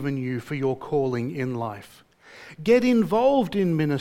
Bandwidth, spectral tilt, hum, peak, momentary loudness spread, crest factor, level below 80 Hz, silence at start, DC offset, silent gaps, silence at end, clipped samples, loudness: 16 kHz; -7.5 dB/octave; none; -6 dBFS; 12 LU; 16 dB; -58 dBFS; 0 s; under 0.1%; none; 0 s; under 0.1%; -24 LUFS